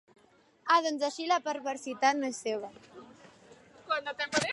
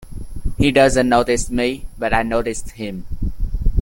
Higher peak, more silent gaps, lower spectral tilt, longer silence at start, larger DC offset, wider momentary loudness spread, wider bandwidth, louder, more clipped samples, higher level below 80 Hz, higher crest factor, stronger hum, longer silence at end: second, -12 dBFS vs -2 dBFS; neither; second, -2.5 dB/octave vs -5 dB/octave; first, 0.65 s vs 0 s; neither; about the same, 14 LU vs 16 LU; second, 11.5 kHz vs 17 kHz; second, -31 LUFS vs -19 LUFS; neither; second, -76 dBFS vs -26 dBFS; about the same, 20 dB vs 16 dB; neither; about the same, 0 s vs 0 s